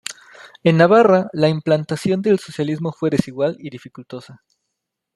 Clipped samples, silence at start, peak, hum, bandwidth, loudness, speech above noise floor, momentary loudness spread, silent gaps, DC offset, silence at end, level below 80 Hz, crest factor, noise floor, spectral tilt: under 0.1%; 0.1 s; -2 dBFS; none; 12 kHz; -17 LUFS; 61 dB; 23 LU; none; under 0.1%; 0.8 s; -60 dBFS; 16 dB; -79 dBFS; -6.5 dB/octave